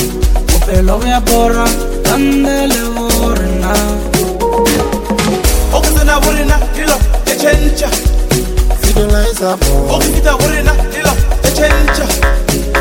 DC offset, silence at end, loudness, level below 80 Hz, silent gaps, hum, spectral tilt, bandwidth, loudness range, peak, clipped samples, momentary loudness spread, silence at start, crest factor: under 0.1%; 0 s; -12 LUFS; -14 dBFS; none; none; -4.5 dB/octave; 17.5 kHz; 1 LU; 0 dBFS; 0.2%; 4 LU; 0 s; 10 dB